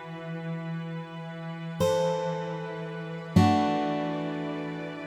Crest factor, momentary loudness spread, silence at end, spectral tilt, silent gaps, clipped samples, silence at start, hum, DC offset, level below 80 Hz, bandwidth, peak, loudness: 22 dB; 14 LU; 0 s; -6.5 dB/octave; none; under 0.1%; 0 s; none; under 0.1%; -60 dBFS; 15.5 kHz; -8 dBFS; -30 LUFS